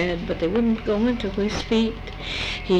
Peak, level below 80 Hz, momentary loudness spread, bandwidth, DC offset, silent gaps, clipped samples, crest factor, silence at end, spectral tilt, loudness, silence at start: -8 dBFS; -36 dBFS; 5 LU; 9.2 kHz; under 0.1%; none; under 0.1%; 16 dB; 0 s; -6 dB/octave; -24 LUFS; 0 s